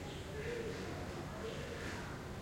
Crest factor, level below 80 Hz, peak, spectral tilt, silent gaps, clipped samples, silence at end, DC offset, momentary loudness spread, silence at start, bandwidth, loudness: 12 dB; -56 dBFS; -32 dBFS; -5 dB/octave; none; under 0.1%; 0 s; under 0.1%; 3 LU; 0 s; 16.5 kHz; -44 LUFS